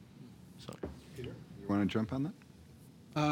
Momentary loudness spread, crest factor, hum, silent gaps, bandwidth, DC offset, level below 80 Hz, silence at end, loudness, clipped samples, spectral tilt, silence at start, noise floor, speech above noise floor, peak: 23 LU; 20 dB; none; none; 16.5 kHz; under 0.1%; -64 dBFS; 0 s; -38 LUFS; under 0.1%; -7 dB/octave; 0 s; -56 dBFS; 21 dB; -18 dBFS